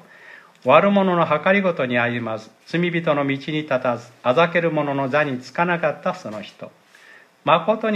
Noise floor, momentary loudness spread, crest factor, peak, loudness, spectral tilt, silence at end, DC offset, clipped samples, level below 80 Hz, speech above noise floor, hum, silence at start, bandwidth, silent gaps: -49 dBFS; 11 LU; 20 dB; 0 dBFS; -20 LUFS; -7 dB/octave; 0 s; under 0.1%; under 0.1%; -72 dBFS; 29 dB; none; 0.25 s; 9.6 kHz; none